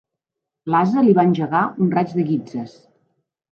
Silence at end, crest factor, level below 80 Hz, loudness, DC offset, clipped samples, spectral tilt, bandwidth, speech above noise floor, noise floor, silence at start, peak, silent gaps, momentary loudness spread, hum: 0.85 s; 16 dB; -66 dBFS; -18 LUFS; under 0.1%; under 0.1%; -9 dB/octave; 6.8 kHz; 66 dB; -83 dBFS; 0.65 s; -4 dBFS; none; 16 LU; none